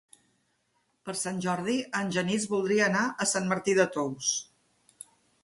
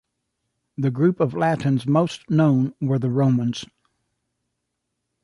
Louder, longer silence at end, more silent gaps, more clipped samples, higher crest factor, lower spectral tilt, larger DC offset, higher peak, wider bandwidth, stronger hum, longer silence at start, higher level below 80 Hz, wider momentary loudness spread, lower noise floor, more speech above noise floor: second, -28 LUFS vs -21 LUFS; second, 1 s vs 1.6 s; neither; neither; about the same, 20 dB vs 16 dB; second, -3.5 dB/octave vs -8 dB/octave; neither; second, -10 dBFS vs -6 dBFS; about the same, 11.5 kHz vs 11.5 kHz; neither; first, 1.05 s vs 0.8 s; second, -70 dBFS vs -62 dBFS; first, 20 LU vs 7 LU; second, -74 dBFS vs -78 dBFS; second, 46 dB vs 58 dB